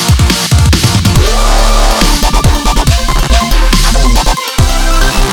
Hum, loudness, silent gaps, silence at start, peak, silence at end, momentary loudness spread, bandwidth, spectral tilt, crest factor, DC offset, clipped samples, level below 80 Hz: none; -10 LUFS; none; 0 s; 0 dBFS; 0 s; 3 LU; 18.5 kHz; -4 dB/octave; 8 dB; 1%; 0.7%; -10 dBFS